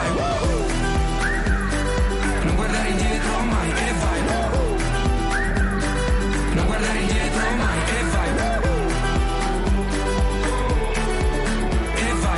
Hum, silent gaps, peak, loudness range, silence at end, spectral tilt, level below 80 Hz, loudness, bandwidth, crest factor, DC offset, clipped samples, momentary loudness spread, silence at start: none; none; -12 dBFS; 1 LU; 0 s; -5 dB/octave; -24 dBFS; -22 LUFS; 11.5 kHz; 10 dB; under 0.1%; under 0.1%; 1 LU; 0 s